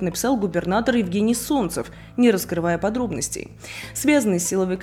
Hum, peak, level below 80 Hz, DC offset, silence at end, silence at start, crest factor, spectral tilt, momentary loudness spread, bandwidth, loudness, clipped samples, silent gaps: none; -4 dBFS; -46 dBFS; under 0.1%; 0 s; 0 s; 16 dB; -4.5 dB/octave; 12 LU; 17 kHz; -22 LUFS; under 0.1%; none